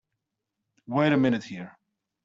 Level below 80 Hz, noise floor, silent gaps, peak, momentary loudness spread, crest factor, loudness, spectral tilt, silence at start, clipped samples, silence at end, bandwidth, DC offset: -68 dBFS; -84 dBFS; none; -10 dBFS; 18 LU; 18 dB; -25 LUFS; -7.5 dB/octave; 0.9 s; under 0.1%; 0.55 s; 7.6 kHz; under 0.1%